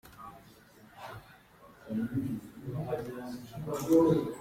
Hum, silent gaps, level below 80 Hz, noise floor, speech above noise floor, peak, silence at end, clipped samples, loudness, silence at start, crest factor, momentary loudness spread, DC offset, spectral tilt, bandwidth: none; none; -62 dBFS; -57 dBFS; 26 dB; -14 dBFS; 0 s; under 0.1%; -32 LUFS; 0.05 s; 20 dB; 24 LU; under 0.1%; -7.5 dB/octave; 16 kHz